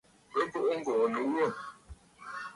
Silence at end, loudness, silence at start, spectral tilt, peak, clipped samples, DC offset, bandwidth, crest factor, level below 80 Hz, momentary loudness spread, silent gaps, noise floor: 0 s; -31 LUFS; 0.3 s; -5.5 dB/octave; -18 dBFS; under 0.1%; under 0.1%; 11.5 kHz; 16 dB; -62 dBFS; 15 LU; none; -53 dBFS